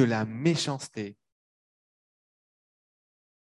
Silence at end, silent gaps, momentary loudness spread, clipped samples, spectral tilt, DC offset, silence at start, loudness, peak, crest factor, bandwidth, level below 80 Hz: 2.45 s; none; 13 LU; under 0.1%; -5.5 dB/octave; under 0.1%; 0 s; -29 LUFS; -10 dBFS; 22 dB; 12 kHz; -70 dBFS